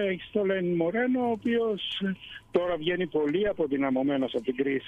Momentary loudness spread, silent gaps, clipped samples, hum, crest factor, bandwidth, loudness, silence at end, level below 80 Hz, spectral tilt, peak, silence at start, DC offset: 4 LU; none; under 0.1%; none; 16 dB; 7.6 kHz; -28 LUFS; 0 s; -60 dBFS; -7.5 dB/octave; -12 dBFS; 0 s; under 0.1%